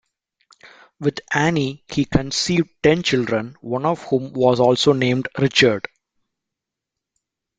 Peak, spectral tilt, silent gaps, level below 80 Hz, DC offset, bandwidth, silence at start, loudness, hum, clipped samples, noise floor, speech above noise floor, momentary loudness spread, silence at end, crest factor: 0 dBFS; -5 dB/octave; none; -48 dBFS; under 0.1%; 9.4 kHz; 0.65 s; -19 LUFS; none; under 0.1%; -84 dBFS; 65 dB; 9 LU; 1.8 s; 20 dB